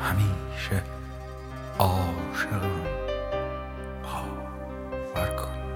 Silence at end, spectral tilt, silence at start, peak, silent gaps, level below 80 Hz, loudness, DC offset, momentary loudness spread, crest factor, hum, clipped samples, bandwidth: 0 s; -6 dB/octave; 0 s; -6 dBFS; none; -38 dBFS; -31 LUFS; under 0.1%; 12 LU; 24 dB; none; under 0.1%; 16.5 kHz